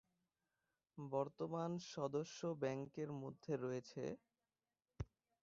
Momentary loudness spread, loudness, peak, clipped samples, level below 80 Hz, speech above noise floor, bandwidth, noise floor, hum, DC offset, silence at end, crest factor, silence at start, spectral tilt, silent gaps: 10 LU; -46 LUFS; -28 dBFS; under 0.1%; -70 dBFS; over 45 dB; 7.4 kHz; under -90 dBFS; none; under 0.1%; 0.4 s; 20 dB; 0.95 s; -6.5 dB/octave; none